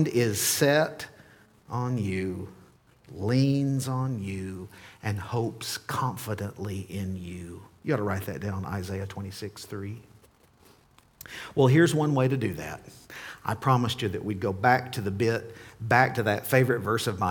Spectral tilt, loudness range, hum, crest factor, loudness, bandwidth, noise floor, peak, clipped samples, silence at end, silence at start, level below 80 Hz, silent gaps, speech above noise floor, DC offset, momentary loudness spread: -5.5 dB/octave; 8 LU; none; 22 dB; -27 LUFS; 19 kHz; -59 dBFS; -6 dBFS; under 0.1%; 0 s; 0 s; -60 dBFS; none; 32 dB; under 0.1%; 18 LU